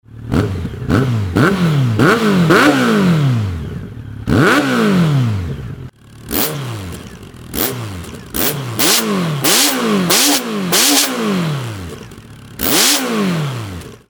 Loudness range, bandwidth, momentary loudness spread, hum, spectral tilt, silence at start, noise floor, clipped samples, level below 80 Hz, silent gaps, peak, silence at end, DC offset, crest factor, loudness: 6 LU; over 20 kHz; 18 LU; none; -4 dB/octave; 0.1 s; -35 dBFS; under 0.1%; -38 dBFS; none; 0 dBFS; 0.1 s; under 0.1%; 16 dB; -14 LUFS